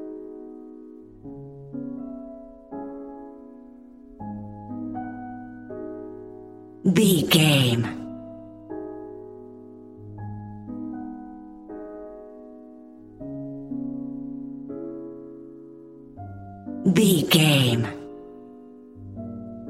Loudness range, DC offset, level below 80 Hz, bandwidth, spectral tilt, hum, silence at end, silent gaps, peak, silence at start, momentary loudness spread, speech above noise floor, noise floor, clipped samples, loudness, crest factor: 16 LU; under 0.1%; -58 dBFS; 16 kHz; -5 dB/octave; none; 0 s; none; -4 dBFS; 0 s; 26 LU; 27 dB; -46 dBFS; under 0.1%; -24 LUFS; 24 dB